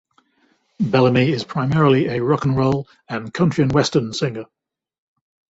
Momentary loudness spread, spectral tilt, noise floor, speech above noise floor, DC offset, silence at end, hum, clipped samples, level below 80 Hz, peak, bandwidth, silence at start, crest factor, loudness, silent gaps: 10 LU; -6.5 dB/octave; -62 dBFS; 44 dB; under 0.1%; 1.05 s; none; under 0.1%; -50 dBFS; -2 dBFS; 8 kHz; 0.8 s; 18 dB; -19 LUFS; none